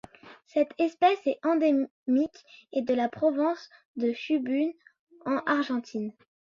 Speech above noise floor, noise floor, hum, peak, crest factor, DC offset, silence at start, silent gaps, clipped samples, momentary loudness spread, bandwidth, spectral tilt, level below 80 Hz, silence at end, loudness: 23 dB; -51 dBFS; none; -12 dBFS; 16 dB; under 0.1%; 0.25 s; 1.90-2.06 s, 3.85-3.94 s, 4.99-5.07 s; under 0.1%; 11 LU; 7.4 kHz; -6 dB/octave; -74 dBFS; 0.35 s; -28 LUFS